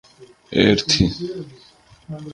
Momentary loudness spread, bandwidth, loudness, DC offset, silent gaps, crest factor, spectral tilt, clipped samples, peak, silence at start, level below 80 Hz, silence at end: 20 LU; 10.5 kHz; -18 LUFS; under 0.1%; none; 22 dB; -4.5 dB/octave; under 0.1%; 0 dBFS; 0.2 s; -40 dBFS; 0 s